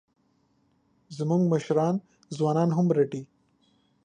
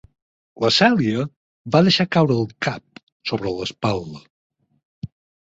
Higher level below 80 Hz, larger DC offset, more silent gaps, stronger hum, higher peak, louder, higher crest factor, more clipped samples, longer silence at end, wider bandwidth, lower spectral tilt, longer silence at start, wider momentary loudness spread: second, -72 dBFS vs -54 dBFS; neither; second, none vs 1.36-1.65 s, 3.03-3.20 s, 4.30-4.50 s, 4.85-5.02 s; neither; second, -12 dBFS vs -2 dBFS; second, -26 LUFS vs -20 LUFS; about the same, 16 dB vs 20 dB; neither; first, 0.8 s vs 0.45 s; first, 9.6 kHz vs 8 kHz; first, -8 dB/octave vs -5.5 dB/octave; first, 1.1 s vs 0.55 s; second, 14 LU vs 22 LU